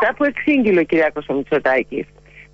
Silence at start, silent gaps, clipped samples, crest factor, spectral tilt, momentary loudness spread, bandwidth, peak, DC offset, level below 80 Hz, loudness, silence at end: 0 s; none; under 0.1%; 12 dB; -7.5 dB/octave; 12 LU; 7.4 kHz; -6 dBFS; under 0.1%; -52 dBFS; -17 LUFS; 0.15 s